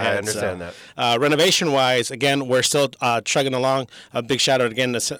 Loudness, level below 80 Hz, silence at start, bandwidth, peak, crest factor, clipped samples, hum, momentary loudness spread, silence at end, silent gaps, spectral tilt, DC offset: -19 LUFS; -62 dBFS; 0 s; over 20 kHz; -6 dBFS; 14 dB; under 0.1%; none; 9 LU; 0 s; none; -3 dB/octave; under 0.1%